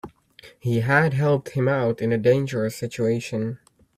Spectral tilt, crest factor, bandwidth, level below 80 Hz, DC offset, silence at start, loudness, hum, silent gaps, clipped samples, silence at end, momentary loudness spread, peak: -7 dB/octave; 18 dB; 15 kHz; -58 dBFS; under 0.1%; 0.05 s; -23 LUFS; none; none; under 0.1%; 0.4 s; 10 LU; -4 dBFS